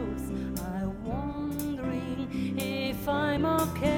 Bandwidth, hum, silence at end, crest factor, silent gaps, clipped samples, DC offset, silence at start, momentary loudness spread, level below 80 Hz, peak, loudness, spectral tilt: 17.5 kHz; none; 0 s; 16 dB; none; under 0.1%; under 0.1%; 0 s; 7 LU; -44 dBFS; -14 dBFS; -31 LUFS; -6 dB/octave